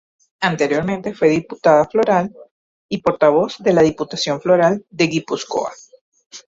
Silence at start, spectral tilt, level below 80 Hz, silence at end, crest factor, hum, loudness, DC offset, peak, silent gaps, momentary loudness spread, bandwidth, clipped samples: 0.4 s; -5.5 dB/octave; -54 dBFS; 0.1 s; 16 dB; none; -17 LUFS; under 0.1%; -2 dBFS; 2.51-2.89 s, 6.01-6.12 s, 6.26-6.30 s; 9 LU; 7.8 kHz; under 0.1%